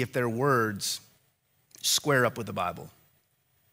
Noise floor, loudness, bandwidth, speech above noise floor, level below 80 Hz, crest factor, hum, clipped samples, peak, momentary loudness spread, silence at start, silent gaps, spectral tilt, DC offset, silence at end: -70 dBFS; -27 LUFS; 16 kHz; 43 dB; -68 dBFS; 20 dB; none; under 0.1%; -10 dBFS; 10 LU; 0 s; none; -3.5 dB/octave; under 0.1%; 0.85 s